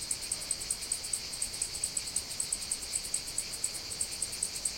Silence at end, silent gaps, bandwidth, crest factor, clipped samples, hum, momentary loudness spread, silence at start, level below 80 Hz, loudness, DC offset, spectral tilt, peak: 0 s; none; 17 kHz; 20 dB; under 0.1%; none; 2 LU; 0 s; -56 dBFS; -33 LUFS; under 0.1%; 0.5 dB/octave; -16 dBFS